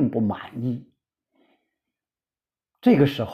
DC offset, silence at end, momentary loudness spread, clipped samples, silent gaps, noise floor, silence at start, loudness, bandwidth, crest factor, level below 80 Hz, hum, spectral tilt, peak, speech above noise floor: under 0.1%; 0 s; 12 LU; under 0.1%; none; under -90 dBFS; 0 s; -23 LUFS; 14 kHz; 20 dB; -60 dBFS; none; -8.5 dB/octave; -6 dBFS; over 69 dB